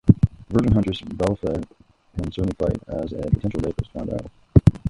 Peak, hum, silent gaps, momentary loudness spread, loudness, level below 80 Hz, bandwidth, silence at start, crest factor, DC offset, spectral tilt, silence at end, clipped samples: 0 dBFS; none; none; 12 LU; -23 LUFS; -32 dBFS; 11 kHz; 0.05 s; 22 dB; under 0.1%; -9 dB/octave; 0 s; under 0.1%